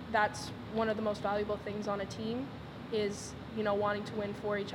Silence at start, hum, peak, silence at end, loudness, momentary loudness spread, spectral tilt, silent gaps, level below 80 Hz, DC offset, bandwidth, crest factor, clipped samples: 0 s; none; -16 dBFS; 0 s; -35 LUFS; 9 LU; -5 dB/octave; none; -60 dBFS; under 0.1%; 16 kHz; 18 dB; under 0.1%